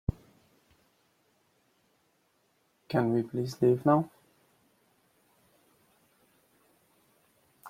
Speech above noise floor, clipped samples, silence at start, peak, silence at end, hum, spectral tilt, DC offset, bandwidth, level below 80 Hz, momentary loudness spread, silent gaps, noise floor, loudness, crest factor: 45 dB; under 0.1%; 0.1 s; -12 dBFS; 0 s; none; -8 dB/octave; under 0.1%; 16 kHz; -54 dBFS; 11 LU; none; -72 dBFS; -29 LUFS; 22 dB